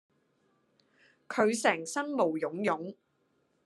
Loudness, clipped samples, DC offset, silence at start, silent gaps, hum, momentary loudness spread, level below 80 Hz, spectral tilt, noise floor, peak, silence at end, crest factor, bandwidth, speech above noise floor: -30 LUFS; under 0.1%; under 0.1%; 1.3 s; none; none; 10 LU; -86 dBFS; -4 dB/octave; -74 dBFS; -12 dBFS; 0.7 s; 22 dB; 12.5 kHz; 44 dB